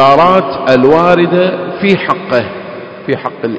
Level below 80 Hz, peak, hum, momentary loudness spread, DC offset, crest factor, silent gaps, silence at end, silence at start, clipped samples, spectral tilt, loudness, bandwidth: -46 dBFS; 0 dBFS; none; 14 LU; under 0.1%; 10 dB; none; 0 s; 0 s; 2%; -7.5 dB/octave; -10 LUFS; 8 kHz